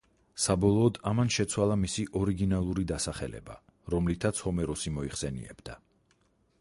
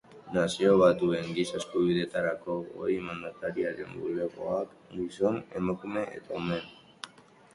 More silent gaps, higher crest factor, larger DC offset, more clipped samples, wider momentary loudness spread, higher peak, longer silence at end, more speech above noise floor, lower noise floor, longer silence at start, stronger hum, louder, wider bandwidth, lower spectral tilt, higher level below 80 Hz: neither; about the same, 18 dB vs 20 dB; neither; neither; first, 19 LU vs 14 LU; about the same, -12 dBFS vs -10 dBFS; first, 0.85 s vs 0.45 s; first, 40 dB vs 26 dB; first, -69 dBFS vs -55 dBFS; first, 0.35 s vs 0.1 s; neither; about the same, -30 LUFS vs -30 LUFS; about the same, 11.5 kHz vs 11.5 kHz; about the same, -5.5 dB/octave vs -6 dB/octave; first, -46 dBFS vs -62 dBFS